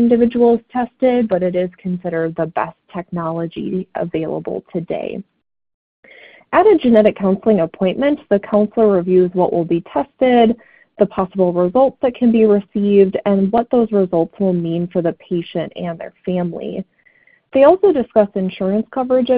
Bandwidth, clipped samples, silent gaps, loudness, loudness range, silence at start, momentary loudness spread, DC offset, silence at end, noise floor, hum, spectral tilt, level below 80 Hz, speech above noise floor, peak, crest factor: 4.7 kHz; under 0.1%; 5.74-6.03 s; -16 LUFS; 8 LU; 0 s; 12 LU; under 0.1%; 0 s; -54 dBFS; none; -11 dB/octave; -52 dBFS; 38 dB; 0 dBFS; 16 dB